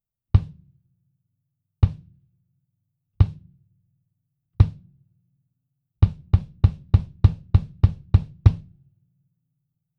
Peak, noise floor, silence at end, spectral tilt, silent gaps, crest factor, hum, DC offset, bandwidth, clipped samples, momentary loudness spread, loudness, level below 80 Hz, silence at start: 0 dBFS; -77 dBFS; 1.4 s; -10 dB/octave; none; 24 dB; none; under 0.1%; 4.8 kHz; under 0.1%; 4 LU; -22 LUFS; -30 dBFS; 0.35 s